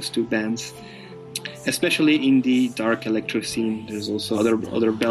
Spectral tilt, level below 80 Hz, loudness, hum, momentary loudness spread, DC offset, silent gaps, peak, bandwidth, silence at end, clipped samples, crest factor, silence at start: -4.5 dB/octave; -60 dBFS; -22 LUFS; none; 14 LU; under 0.1%; none; -8 dBFS; 13 kHz; 0 s; under 0.1%; 14 dB; 0 s